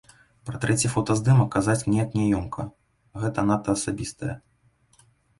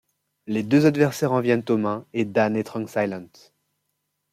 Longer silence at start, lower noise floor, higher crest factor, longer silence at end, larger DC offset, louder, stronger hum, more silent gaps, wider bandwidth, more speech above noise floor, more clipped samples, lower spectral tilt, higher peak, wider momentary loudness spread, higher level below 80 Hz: about the same, 0.45 s vs 0.45 s; second, -63 dBFS vs -76 dBFS; about the same, 18 dB vs 18 dB; about the same, 1 s vs 1.1 s; neither; about the same, -24 LUFS vs -22 LUFS; neither; neither; second, 11.5 kHz vs 15.5 kHz; second, 40 dB vs 54 dB; neither; about the same, -6 dB/octave vs -7 dB/octave; about the same, -8 dBFS vs -6 dBFS; first, 17 LU vs 10 LU; first, -48 dBFS vs -66 dBFS